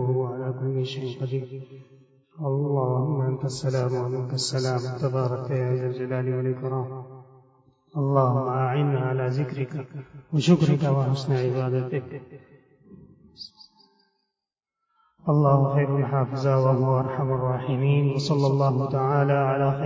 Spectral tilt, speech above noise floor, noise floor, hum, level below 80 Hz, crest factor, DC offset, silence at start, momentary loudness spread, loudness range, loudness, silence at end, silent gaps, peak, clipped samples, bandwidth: -7.5 dB/octave; 64 dB; -87 dBFS; none; -60 dBFS; 18 dB; under 0.1%; 0 s; 12 LU; 6 LU; -25 LUFS; 0 s; none; -6 dBFS; under 0.1%; 8 kHz